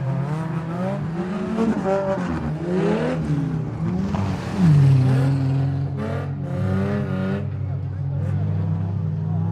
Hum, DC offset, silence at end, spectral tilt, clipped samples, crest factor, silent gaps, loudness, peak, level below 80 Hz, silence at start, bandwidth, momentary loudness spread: none; under 0.1%; 0 s; -9 dB/octave; under 0.1%; 14 dB; none; -22 LUFS; -8 dBFS; -46 dBFS; 0 s; 9.2 kHz; 9 LU